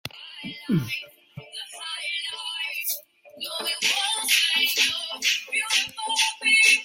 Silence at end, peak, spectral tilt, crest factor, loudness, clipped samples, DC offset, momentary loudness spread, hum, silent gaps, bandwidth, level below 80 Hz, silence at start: 0 s; -6 dBFS; -1 dB/octave; 20 dB; -23 LUFS; under 0.1%; under 0.1%; 18 LU; none; none; 16.5 kHz; -68 dBFS; 0.05 s